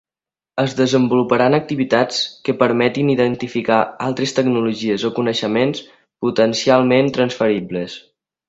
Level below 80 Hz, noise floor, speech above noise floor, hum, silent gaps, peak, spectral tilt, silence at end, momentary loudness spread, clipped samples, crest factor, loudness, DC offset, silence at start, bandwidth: -58 dBFS; under -90 dBFS; over 73 dB; none; none; 0 dBFS; -5.5 dB/octave; 0.5 s; 7 LU; under 0.1%; 18 dB; -17 LUFS; under 0.1%; 0.55 s; 7.8 kHz